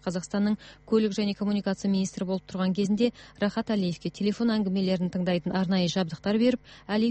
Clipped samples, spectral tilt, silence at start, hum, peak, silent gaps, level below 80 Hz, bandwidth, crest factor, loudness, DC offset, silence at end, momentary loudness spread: under 0.1%; -6.5 dB/octave; 0.05 s; none; -10 dBFS; none; -58 dBFS; 8.4 kHz; 16 dB; -27 LUFS; under 0.1%; 0 s; 6 LU